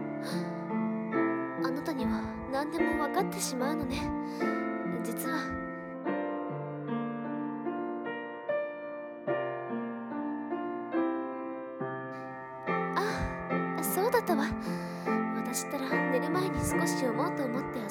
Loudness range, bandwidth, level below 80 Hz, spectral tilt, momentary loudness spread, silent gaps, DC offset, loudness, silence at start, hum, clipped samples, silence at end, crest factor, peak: 5 LU; 18 kHz; -54 dBFS; -5 dB/octave; 8 LU; none; under 0.1%; -33 LUFS; 0 s; none; under 0.1%; 0 s; 18 dB; -14 dBFS